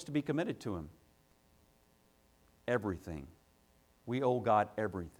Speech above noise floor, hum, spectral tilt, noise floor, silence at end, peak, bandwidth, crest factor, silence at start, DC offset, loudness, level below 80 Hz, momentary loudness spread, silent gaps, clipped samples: 34 dB; none; -7 dB/octave; -69 dBFS; 0.1 s; -16 dBFS; 19.5 kHz; 22 dB; 0 s; under 0.1%; -36 LUFS; -62 dBFS; 18 LU; none; under 0.1%